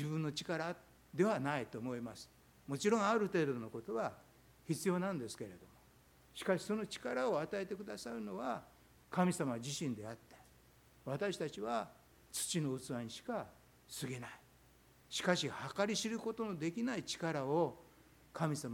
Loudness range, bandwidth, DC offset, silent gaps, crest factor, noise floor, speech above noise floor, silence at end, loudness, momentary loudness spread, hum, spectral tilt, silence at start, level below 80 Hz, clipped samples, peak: 4 LU; 17.5 kHz; under 0.1%; none; 24 dB; -66 dBFS; 27 dB; 0 s; -39 LUFS; 16 LU; none; -5 dB/octave; 0 s; -72 dBFS; under 0.1%; -18 dBFS